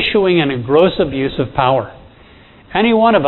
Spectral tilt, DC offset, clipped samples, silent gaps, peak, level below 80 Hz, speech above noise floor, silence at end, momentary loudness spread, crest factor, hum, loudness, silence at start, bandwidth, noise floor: -9.5 dB/octave; under 0.1%; under 0.1%; none; 0 dBFS; -40 dBFS; 30 dB; 0 s; 7 LU; 14 dB; none; -14 LUFS; 0 s; 4.2 kHz; -43 dBFS